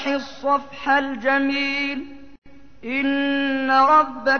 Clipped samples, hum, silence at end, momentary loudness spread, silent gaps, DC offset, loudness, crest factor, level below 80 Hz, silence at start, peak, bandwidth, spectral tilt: under 0.1%; none; 0 s; 11 LU; 2.38-2.42 s; 0.8%; -20 LUFS; 14 dB; -56 dBFS; 0 s; -6 dBFS; 6.6 kHz; -4 dB/octave